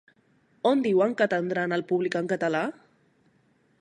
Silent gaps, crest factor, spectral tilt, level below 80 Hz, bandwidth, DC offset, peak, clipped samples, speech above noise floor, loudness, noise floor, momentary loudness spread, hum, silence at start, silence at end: none; 18 dB; -6.5 dB/octave; -76 dBFS; 10 kHz; under 0.1%; -10 dBFS; under 0.1%; 41 dB; -26 LUFS; -65 dBFS; 6 LU; none; 0.65 s; 1.1 s